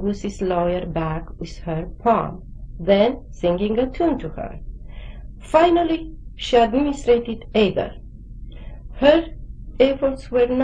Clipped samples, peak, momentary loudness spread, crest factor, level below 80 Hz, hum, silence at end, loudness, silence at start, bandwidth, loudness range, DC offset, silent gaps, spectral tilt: under 0.1%; 0 dBFS; 23 LU; 20 dB; -36 dBFS; none; 0 s; -20 LUFS; 0 s; 10 kHz; 3 LU; under 0.1%; none; -6.5 dB/octave